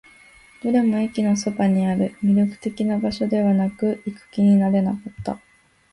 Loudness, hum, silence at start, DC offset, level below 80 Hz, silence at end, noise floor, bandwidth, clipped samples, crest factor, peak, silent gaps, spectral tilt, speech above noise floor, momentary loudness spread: -21 LUFS; none; 0.65 s; under 0.1%; -56 dBFS; 0.55 s; -50 dBFS; 11.5 kHz; under 0.1%; 12 dB; -10 dBFS; none; -7.5 dB/octave; 30 dB; 13 LU